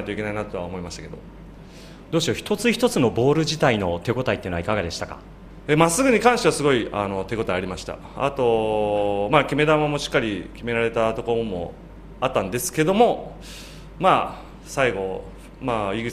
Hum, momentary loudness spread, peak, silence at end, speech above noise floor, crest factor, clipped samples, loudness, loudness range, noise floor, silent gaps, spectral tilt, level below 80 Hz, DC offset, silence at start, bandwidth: none; 18 LU; -2 dBFS; 0 s; 20 dB; 20 dB; under 0.1%; -22 LUFS; 3 LU; -42 dBFS; none; -5 dB/octave; -44 dBFS; under 0.1%; 0 s; 15 kHz